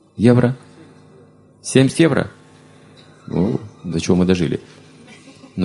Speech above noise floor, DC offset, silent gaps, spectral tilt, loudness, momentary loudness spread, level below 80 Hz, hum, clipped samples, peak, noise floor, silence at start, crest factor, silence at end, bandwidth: 32 dB; under 0.1%; none; -6.5 dB/octave; -17 LUFS; 16 LU; -44 dBFS; none; under 0.1%; 0 dBFS; -48 dBFS; 0.15 s; 20 dB; 0 s; 11.5 kHz